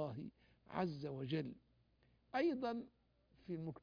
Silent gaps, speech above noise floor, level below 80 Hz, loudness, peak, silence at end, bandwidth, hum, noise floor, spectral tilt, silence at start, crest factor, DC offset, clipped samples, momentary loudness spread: none; 33 dB; -74 dBFS; -44 LUFS; -26 dBFS; 0 s; 5.2 kHz; none; -75 dBFS; -6 dB/octave; 0 s; 18 dB; under 0.1%; under 0.1%; 18 LU